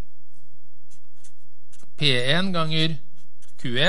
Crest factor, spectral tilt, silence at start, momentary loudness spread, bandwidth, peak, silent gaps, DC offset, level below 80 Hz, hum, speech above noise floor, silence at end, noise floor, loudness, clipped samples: 22 dB; -5 dB/octave; 2 s; 13 LU; 11.5 kHz; -4 dBFS; none; 10%; -66 dBFS; none; 41 dB; 0 s; -63 dBFS; -23 LUFS; under 0.1%